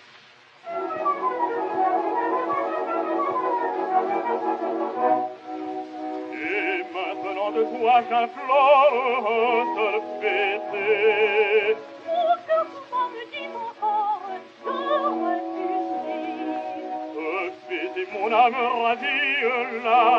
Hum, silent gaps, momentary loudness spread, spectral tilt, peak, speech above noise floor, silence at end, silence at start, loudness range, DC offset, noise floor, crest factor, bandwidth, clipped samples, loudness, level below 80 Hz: none; none; 12 LU; -4.5 dB/octave; -6 dBFS; 30 dB; 0 s; 0.15 s; 6 LU; under 0.1%; -51 dBFS; 18 dB; 7.2 kHz; under 0.1%; -24 LUFS; -88 dBFS